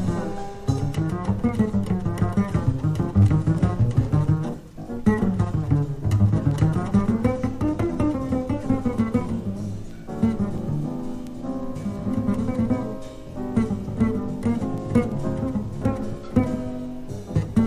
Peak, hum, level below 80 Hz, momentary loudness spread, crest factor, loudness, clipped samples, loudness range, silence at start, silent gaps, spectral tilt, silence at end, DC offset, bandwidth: -4 dBFS; none; -36 dBFS; 11 LU; 18 dB; -24 LUFS; under 0.1%; 5 LU; 0 s; none; -9 dB/octave; 0 s; under 0.1%; 12.5 kHz